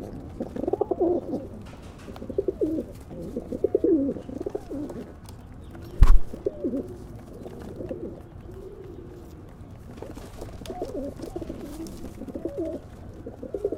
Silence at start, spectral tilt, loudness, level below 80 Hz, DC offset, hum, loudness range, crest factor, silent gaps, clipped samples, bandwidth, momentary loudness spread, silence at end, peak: 0 s; -8.5 dB/octave; -30 LUFS; -30 dBFS; under 0.1%; none; 12 LU; 26 dB; none; under 0.1%; 11 kHz; 18 LU; 0 s; 0 dBFS